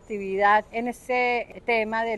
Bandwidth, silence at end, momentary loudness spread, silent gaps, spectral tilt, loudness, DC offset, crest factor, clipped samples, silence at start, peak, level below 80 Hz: 12.5 kHz; 0 s; 10 LU; none; -4.5 dB/octave; -24 LUFS; under 0.1%; 16 dB; under 0.1%; 0.1 s; -8 dBFS; -56 dBFS